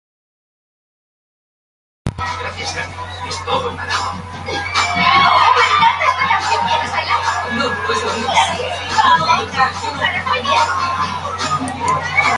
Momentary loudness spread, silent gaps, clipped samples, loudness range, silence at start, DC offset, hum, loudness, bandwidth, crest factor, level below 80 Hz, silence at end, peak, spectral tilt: 13 LU; none; under 0.1%; 10 LU; 2.05 s; under 0.1%; none; -16 LUFS; 11.5 kHz; 18 dB; -40 dBFS; 0 s; 0 dBFS; -3 dB/octave